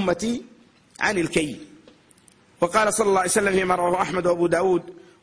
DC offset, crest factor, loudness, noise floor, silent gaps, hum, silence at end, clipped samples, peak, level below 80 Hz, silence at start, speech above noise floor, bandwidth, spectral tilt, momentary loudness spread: under 0.1%; 16 dB; -22 LUFS; -55 dBFS; none; none; 0.3 s; under 0.1%; -6 dBFS; -54 dBFS; 0 s; 34 dB; 10.5 kHz; -4 dB/octave; 8 LU